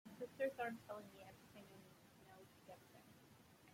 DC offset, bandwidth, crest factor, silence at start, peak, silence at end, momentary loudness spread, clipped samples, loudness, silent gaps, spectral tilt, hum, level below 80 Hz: under 0.1%; 16.5 kHz; 22 dB; 0.05 s; -30 dBFS; 0 s; 21 LU; under 0.1%; -50 LUFS; none; -5 dB/octave; none; -86 dBFS